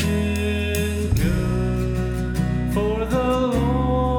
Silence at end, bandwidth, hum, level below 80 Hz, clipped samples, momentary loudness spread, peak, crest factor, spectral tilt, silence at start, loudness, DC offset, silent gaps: 0 s; 20 kHz; none; -28 dBFS; under 0.1%; 3 LU; -8 dBFS; 12 dB; -6.5 dB/octave; 0 s; -22 LUFS; under 0.1%; none